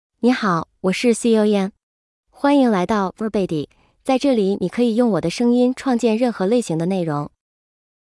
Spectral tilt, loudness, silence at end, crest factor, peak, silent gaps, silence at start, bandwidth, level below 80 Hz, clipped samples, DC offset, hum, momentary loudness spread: -6 dB/octave; -19 LUFS; 0.8 s; 14 dB; -6 dBFS; 1.83-2.23 s; 0.25 s; 12 kHz; -56 dBFS; under 0.1%; under 0.1%; none; 8 LU